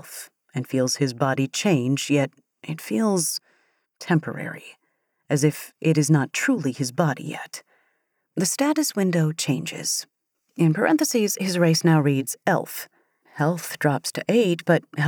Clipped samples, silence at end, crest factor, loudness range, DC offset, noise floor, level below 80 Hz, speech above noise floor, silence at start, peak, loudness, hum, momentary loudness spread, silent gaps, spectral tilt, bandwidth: under 0.1%; 0 s; 18 dB; 4 LU; under 0.1%; -73 dBFS; -80 dBFS; 50 dB; 0.05 s; -6 dBFS; -23 LUFS; none; 14 LU; none; -5 dB/octave; over 20 kHz